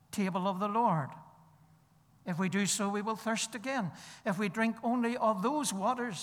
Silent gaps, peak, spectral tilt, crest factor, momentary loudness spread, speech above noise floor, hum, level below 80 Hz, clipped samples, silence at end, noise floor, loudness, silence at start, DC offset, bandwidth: none; -18 dBFS; -4.5 dB/octave; 16 dB; 9 LU; 32 dB; none; -78 dBFS; under 0.1%; 0 s; -65 dBFS; -32 LUFS; 0.1 s; under 0.1%; 17.5 kHz